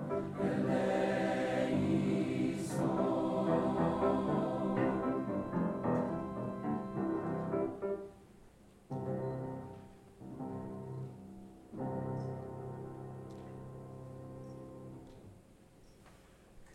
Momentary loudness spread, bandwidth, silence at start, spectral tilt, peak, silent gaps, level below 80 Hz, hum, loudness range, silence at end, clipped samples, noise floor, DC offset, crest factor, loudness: 18 LU; 13 kHz; 0 s; -7.5 dB/octave; -20 dBFS; none; -62 dBFS; none; 15 LU; 0 s; under 0.1%; -60 dBFS; under 0.1%; 16 dB; -36 LUFS